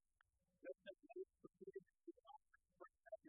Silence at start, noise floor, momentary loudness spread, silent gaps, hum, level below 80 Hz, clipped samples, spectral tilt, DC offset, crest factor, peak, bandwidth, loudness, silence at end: 0.6 s; -85 dBFS; 9 LU; none; none; under -90 dBFS; under 0.1%; 1.5 dB/octave; under 0.1%; 18 dB; -42 dBFS; 1.9 kHz; -61 LUFS; 0 s